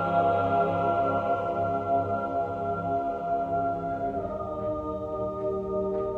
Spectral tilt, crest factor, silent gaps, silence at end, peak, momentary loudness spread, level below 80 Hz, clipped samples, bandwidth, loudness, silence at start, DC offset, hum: -9 dB/octave; 14 dB; none; 0 s; -12 dBFS; 7 LU; -52 dBFS; under 0.1%; 6.6 kHz; -28 LUFS; 0 s; under 0.1%; none